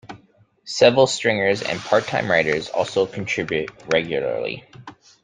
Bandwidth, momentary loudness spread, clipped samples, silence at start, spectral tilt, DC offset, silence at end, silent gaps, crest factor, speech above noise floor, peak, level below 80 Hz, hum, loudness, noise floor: 9.6 kHz; 10 LU; under 0.1%; 0.05 s; -4 dB/octave; under 0.1%; 0.35 s; none; 20 dB; 36 dB; -2 dBFS; -58 dBFS; none; -20 LUFS; -56 dBFS